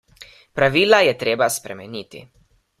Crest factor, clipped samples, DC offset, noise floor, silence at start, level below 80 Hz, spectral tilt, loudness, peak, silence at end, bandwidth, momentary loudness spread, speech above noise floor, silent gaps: 20 dB; under 0.1%; under 0.1%; -47 dBFS; 0.55 s; -56 dBFS; -3.5 dB/octave; -17 LUFS; 0 dBFS; 0.6 s; 15.5 kHz; 19 LU; 28 dB; none